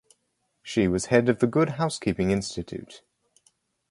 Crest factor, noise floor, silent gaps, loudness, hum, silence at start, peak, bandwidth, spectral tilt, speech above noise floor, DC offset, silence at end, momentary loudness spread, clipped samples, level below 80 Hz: 22 dB; -75 dBFS; none; -25 LUFS; none; 0.65 s; -4 dBFS; 11.5 kHz; -6 dB/octave; 50 dB; under 0.1%; 0.95 s; 15 LU; under 0.1%; -50 dBFS